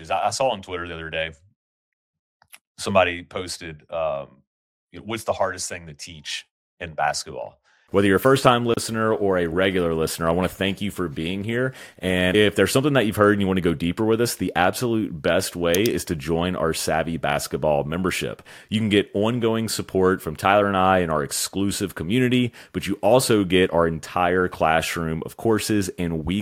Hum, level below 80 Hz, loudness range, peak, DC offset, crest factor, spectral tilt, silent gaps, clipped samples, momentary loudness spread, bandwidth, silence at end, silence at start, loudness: none; -48 dBFS; 7 LU; -2 dBFS; under 0.1%; 20 dB; -4.5 dB/octave; 1.56-2.40 s, 2.61-2.75 s, 4.47-4.87 s, 6.51-6.77 s; under 0.1%; 12 LU; 17 kHz; 0 s; 0 s; -22 LUFS